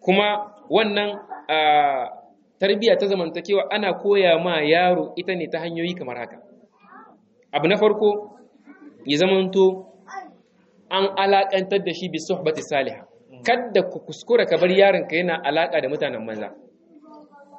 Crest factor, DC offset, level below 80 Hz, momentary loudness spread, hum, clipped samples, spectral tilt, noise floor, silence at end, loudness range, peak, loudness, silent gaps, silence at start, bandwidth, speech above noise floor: 20 dB; under 0.1%; -70 dBFS; 15 LU; none; under 0.1%; -5.5 dB/octave; -57 dBFS; 0 s; 4 LU; -2 dBFS; -21 LUFS; none; 0.05 s; 8.2 kHz; 37 dB